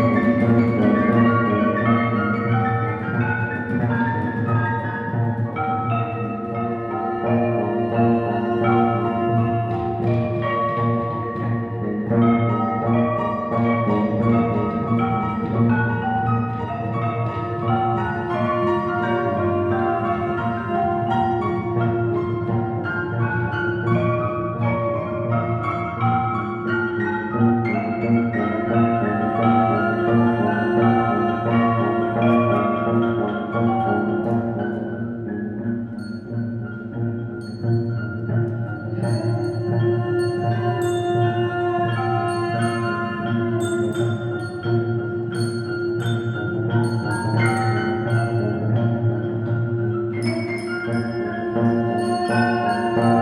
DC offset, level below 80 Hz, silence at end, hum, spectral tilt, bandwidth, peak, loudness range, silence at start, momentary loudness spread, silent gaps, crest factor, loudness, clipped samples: under 0.1%; -54 dBFS; 0 s; none; -8.5 dB/octave; 11 kHz; -4 dBFS; 4 LU; 0 s; 7 LU; none; 16 dB; -21 LUFS; under 0.1%